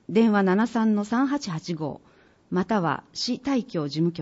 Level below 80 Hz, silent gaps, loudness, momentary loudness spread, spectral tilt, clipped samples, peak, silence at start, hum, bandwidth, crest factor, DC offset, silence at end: -64 dBFS; none; -25 LUFS; 10 LU; -6 dB/octave; under 0.1%; -10 dBFS; 0.1 s; none; 8 kHz; 14 dB; under 0.1%; 0 s